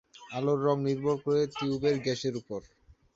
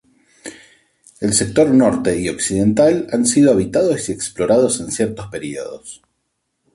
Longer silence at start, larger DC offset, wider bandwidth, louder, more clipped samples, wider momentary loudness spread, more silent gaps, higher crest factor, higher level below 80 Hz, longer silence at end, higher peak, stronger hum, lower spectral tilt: second, 0.2 s vs 0.45 s; neither; second, 7.8 kHz vs 11.5 kHz; second, -30 LUFS vs -16 LUFS; neither; second, 12 LU vs 20 LU; neither; about the same, 16 dB vs 16 dB; second, -64 dBFS vs -46 dBFS; second, 0.5 s vs 0.8 s; second, -14 dBFS vs -2 dBFS; neither; first, -6.5 dB/octave vs -4.5 dB/octave